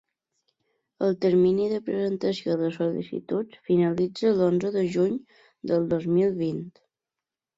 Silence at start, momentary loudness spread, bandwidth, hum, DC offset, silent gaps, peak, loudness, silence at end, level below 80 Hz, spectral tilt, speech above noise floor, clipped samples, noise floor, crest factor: 1 s; 9 LU; 7.8 kHz; none; under 0.1%; none; -12 dBFS; -25 LUFS; 0.9 s; -64 dBFS; -8 dB/octave; 65 dB; under 0.1%; -89 dBFS; 14 dB